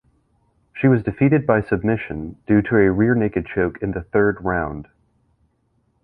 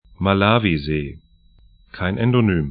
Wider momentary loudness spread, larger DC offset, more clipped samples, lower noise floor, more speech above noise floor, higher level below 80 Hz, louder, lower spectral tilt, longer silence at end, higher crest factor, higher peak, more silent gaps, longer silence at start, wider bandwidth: first, 13 LU vs 10 LU; neither; neither; first, -65 dBFS vs -52 dBFS; first, 47 dB vs 33 dB; about the same, -42 dBFS vs -40 dBFS; about the same, -19 LUFS vs -19 LUFS; about the same, -11.5 dB/octave vs -12 dB/octave; first, 1.2 s vs 0 s; about the same, 18 dB vs 20 dB; about the same, -2 dBFS vs 0 dBFS; neither; first, 0.75 s vs 0.2 s; second, 4.5 kHz vs 5 kHz